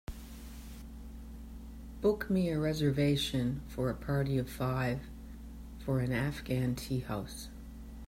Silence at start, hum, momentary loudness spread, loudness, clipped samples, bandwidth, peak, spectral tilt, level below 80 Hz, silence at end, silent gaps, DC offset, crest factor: 0.1 s; none; 18 LU; -33 LUFS; under 0.1%; 16 kHz; -18 dBFS; -6.5 dB/octave; -48 dBFS; 0 s; none; under 0.1%; 16 dB